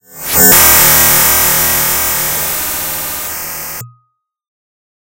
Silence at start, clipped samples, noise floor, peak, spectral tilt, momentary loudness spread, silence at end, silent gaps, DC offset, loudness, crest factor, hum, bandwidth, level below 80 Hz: 0.1 s; 0.5%; -62 dBFS; 0 dBFS; -1 dB/octave; 16 LU; 1.3 s; none; under 0.1%; -8 LUFS; 12 dB; none; over 20 kHz; -36 dBFS